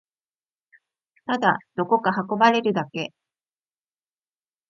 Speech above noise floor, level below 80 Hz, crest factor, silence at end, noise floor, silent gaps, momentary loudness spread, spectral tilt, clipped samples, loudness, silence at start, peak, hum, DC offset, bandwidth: over 68 dB; -74 dBFS; 22 dB; 1.6 s; under -90 dBFS; none; 13 LU; -6 dB/octave; under 0.1%; -22 LUFS; 1.3 s; -4 dBFS; none; under 0.1%; 7.4 kHz